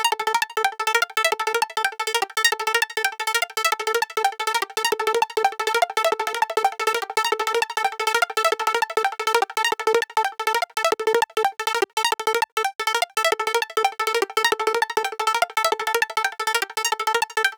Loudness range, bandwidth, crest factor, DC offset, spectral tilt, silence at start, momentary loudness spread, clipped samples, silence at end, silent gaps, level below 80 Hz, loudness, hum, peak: 1 LU; over 20 kHz; 18 dB; under 0.1%; 1 dB/octave; 0 s; 3 LU; under 0.1%; 0 s; 11.93-11.97 s, 12.52-12.57 s, 12.75-12.79 s; -82 dBFS; -22 LUFS; none; -4 dBFS